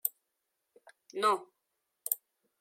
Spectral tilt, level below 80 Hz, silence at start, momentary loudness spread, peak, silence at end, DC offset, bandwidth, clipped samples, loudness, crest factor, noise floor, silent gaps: -1 dB/octave; under -90 dBFS; 0.05 s; 13 LU; -10 dBFS; 0.45 s; under 0.1%; 16.5 kHz; under 0.1%; -34 LUFS; 28 dB; -84 dBFS; none